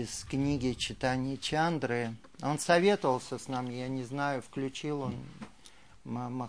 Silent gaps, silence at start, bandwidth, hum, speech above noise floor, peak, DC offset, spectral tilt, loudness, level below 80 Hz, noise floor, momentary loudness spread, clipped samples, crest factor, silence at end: none; 0 s; 10.5 kHz; none; 26 dB; -10 dBFS; 0.1%; -5 dB/octave; -32 LUFS; -56 dBFS; -58 dBFS; 13 LU; under 0.1%; 22 dB; 0 s